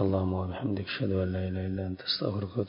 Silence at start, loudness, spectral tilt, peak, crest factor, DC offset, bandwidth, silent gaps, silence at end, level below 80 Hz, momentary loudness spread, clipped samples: 0 s; -31 LUFS; -10.5 dB/octave; -12 dBFS; 18 dB; under 0.1%; 5.4 kHz; none; 0 s; -44 dBFS; 4 LU; under 0.1%